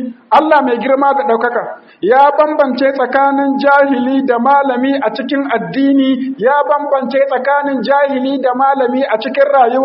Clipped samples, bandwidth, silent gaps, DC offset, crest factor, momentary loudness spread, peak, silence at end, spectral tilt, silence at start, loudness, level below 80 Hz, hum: under 0.1%; 5.8 kHz; none; under 0.1%; 12 dB; 6 LU; 0 dBFS; 0 s; -3 dB/octave; 0 s; -12 LUFS; -62 dBFS; none